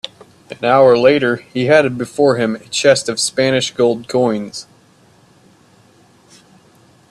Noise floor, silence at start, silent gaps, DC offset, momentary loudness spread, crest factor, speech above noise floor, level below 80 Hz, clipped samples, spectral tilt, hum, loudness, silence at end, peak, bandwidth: -50 dBFS; 0.5 s; none; under 0.1%; 12 LU; 16 dB; 36 dB; -58 dBFS; under 0.1%; -4 dB/octave; none; -14 LUFS; 2.5 s; 0 dBFS; 13 kHz